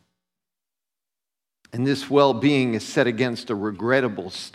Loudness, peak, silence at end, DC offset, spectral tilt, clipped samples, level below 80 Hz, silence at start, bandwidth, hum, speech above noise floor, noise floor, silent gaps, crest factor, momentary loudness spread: -22 LUFS; -4 dBFS; 0.05 s; under 0.1%; -6 dB/octave; under 0.1%; -68 dBFS; 1.75 s; 12.5 kHz; none; 67 dB; -89 dBFS; none; 20 dB; 9 LU